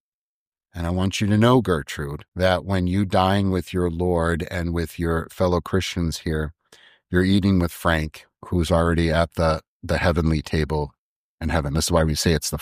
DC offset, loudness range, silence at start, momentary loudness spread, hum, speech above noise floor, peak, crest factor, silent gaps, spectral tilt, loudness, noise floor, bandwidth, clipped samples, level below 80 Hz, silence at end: under 0.1%; 3 LU; 0.75 s; 9 LU; none; over 69 dB; -4 dBFS; 18 dB; 2.28-2.32 s, 9.68-9.80 s, 10.98-11.38 s; -6 dB/octave; -22 LUFS; under -90 dBFS; 15.5 kHz; under 0.1%; -38 dBFS; 0 s